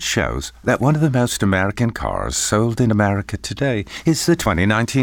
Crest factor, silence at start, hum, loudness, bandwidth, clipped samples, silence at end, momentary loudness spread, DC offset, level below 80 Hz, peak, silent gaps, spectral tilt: 14 dB; 0 s; none; -19 LUFS; 19 kHz; under 0.1%; 0 s; 6 LU; under 0.1%; -36 dBFS; -4 dBFS; none; -5 dB/octave